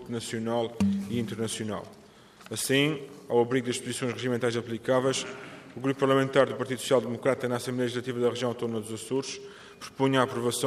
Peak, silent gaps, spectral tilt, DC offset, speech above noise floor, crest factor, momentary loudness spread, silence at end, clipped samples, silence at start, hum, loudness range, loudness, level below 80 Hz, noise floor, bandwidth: -8 dBFS; none; -4.5 dB/octave; under 0.1%; 24 dB; 20 dB; 13 LU; 0 s; under 0.1%; 0 s; none; 3 LU; -28 LUFS; -68 dBFS; -52 dBFS; 15 kHz